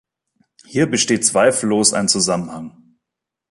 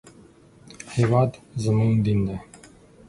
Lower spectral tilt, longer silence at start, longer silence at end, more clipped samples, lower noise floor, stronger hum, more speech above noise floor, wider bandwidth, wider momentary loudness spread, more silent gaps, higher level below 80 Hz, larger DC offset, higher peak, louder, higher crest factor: second, -3 dB/octave vs -8 dB/octave; first, 0.7 s vs 0.05 s; first, 0.8 s vs 0.65 s; neither; first, -83 dBFS vs -51 dBFS; neither; first, 66 dB vs 30 dB; about the same, 11.5 kHz vs 11.5 kHz; first, 15 LU vs 12 LU; neither; second, -58 dBFS vs -48 dBFS; neither; first, 0 dBFS vs -6 dBFS; first, -16 LUFS vs -23 LUFS; about the same, 18 dB vs 18 dB